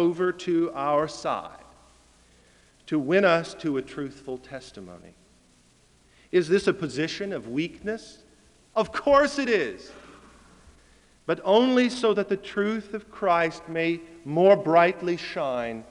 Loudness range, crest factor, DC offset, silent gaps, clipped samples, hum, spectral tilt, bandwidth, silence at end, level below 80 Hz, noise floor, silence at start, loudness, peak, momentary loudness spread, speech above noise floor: 6 LU; 20 dB; under 0.1%; none; under 0.1%; none; -5.5 dB/octave; 11 kHz; 0.05 s; -60 dBFS; -60 dBFS; 0 s; -25 LUFS; -6 dBFS; 17 LU; 35 dB